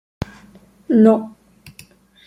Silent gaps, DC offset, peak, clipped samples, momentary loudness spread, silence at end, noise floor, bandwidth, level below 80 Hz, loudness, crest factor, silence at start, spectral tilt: none; under 0.1%; -2 dBFS; under 0.1%; 20 LU; 1 s; -48 dBFS; 11.5 kHz; -48 dBFS; -15 LUFS; 18 dB; 0.9 s; -8.5 dB/octave